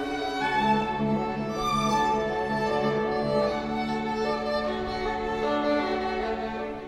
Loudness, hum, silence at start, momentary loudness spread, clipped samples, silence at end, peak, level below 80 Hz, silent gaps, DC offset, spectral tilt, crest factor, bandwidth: -27 LUFS; none; 0 s; 5 LU; under 0.1%; 0 s; -12 dBFS; -48 dBFS; none; under 0.1%; -5.5 dB/octave; 16 dB; 14 kHz